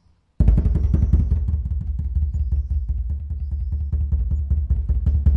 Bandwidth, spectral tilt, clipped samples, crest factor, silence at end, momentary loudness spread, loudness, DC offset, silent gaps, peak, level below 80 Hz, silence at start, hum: 1.8 kHz; -11 dB/octave; under 0.1%; 16 dB; 0 s; 8 LU; -23 LUFS; under 0.1%; none; -4 dBFS; -22 dBFS; 0.4 s; none